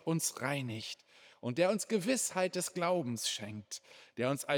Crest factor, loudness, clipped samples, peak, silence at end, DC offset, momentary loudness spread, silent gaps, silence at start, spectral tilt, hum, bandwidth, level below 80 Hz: 20 dB; -35 LUFS; under 0.1%; -16 dBFS; 0 s; under 0.1%; 13 LU; none; 0.05 s; -4 dB/octave; none; over 20 kHz; -88 dBFS